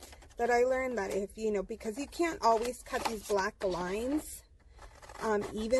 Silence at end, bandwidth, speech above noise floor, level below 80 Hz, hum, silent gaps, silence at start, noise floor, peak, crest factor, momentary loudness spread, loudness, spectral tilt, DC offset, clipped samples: 0 s; 12 kHz; 23 dB; -54 dBFS; none; none; 0 s; -55 dBFS; -14 dBFS; 18 dB; 11 LU; -33 LUFS; -4 dB/octave; under 0.1%; under 0.1%